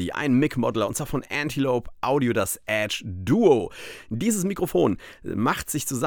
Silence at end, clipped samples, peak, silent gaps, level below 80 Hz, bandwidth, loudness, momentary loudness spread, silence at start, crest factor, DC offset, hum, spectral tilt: 0 s; under 0.1%; -6 dBFS; none; -48 dBFS; over 20 kHz; -24 LUFS; 9 LU; 0 s; 18 dB; under 0.1%; none; -5 dB/octave